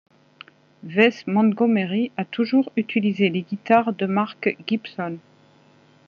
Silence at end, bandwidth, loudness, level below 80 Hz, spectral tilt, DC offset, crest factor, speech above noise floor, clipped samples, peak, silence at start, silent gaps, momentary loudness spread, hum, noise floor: 0.9 s; 6.8 kHz; -22 LUFS; -74 dBFS; -5 dB/octave; under 0.1%; 20 dB; 34 dB; under 0.1%; -2 dBFS; 0.85 s; none; 9 LU; none; -55 dBFS